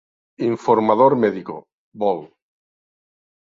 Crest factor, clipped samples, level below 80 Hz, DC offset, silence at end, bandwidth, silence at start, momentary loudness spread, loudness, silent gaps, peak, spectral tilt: 20 dB; under 0.1%; -64 dBFS; under 0.1%; 1.2 s; 7.6 kHz; 0.4 s; 16 LU; -19 LUFS; 1.73-1.92 s; -2 dBFS; -8 dB/octave